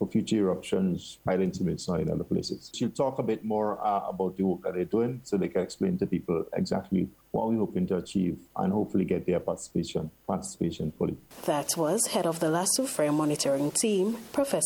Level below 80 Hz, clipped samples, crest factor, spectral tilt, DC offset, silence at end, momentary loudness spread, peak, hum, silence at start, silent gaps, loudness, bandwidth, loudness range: -58 dBFS; under 0.1%; 16 dB; -5 dB/octave; under 0.1%; 0 s; 6 LU; -12 dBFS; none; 0 s; none; -29 LUFS; 17.5 kHz; 3 LU